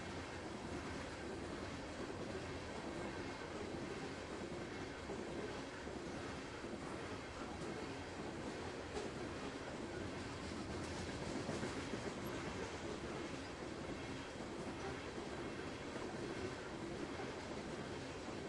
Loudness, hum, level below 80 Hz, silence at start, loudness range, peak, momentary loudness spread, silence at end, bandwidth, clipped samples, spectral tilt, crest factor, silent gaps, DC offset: -47 LUFS; none; -62 dBFS; 0 s; 2 LU; -30 dBFS; 3 LU; 0 s; 12 kHz; under 0.1%; -5 dB/octave; 16 dB; none; under 0.1%